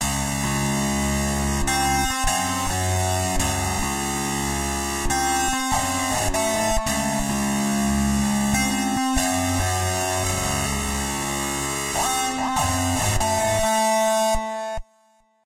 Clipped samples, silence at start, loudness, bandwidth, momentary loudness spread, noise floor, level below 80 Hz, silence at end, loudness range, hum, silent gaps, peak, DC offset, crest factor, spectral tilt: under 0.1%; 0 s; -22 LUFS; 16 kHz; 4 LU; -60 dBFS; -34 dBFS; 0.65 s; 1 LU; none; none; -8 dBFS; under 0.1%; 14 dB; -3.5 dB/octave